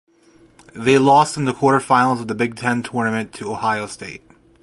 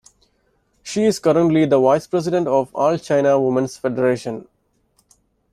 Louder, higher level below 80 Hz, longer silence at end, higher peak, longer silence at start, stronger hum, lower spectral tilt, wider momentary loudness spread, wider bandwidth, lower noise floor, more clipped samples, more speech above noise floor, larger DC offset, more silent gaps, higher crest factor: about the same, -18 LUFS vs -18 LUFS; about the same, -56 dBFS vs -58 dBFS; second, 0.45 s vs 1.1 s; about the same, -2 dBFS vs -2 dBFS; about the same, 0.75 s vs 0.85 s; neither; about the same, -5.5 dB/octave vs -6.5 dB/octave; first, 15 LU vs 10 LU; second, 11.5 kHz vs 14 kHz; second, -52 dBFS vs -64 dBFS; neither; second, 34 dB vs 47 dB; neither; neither; about the same, 18 dB vs 16 dB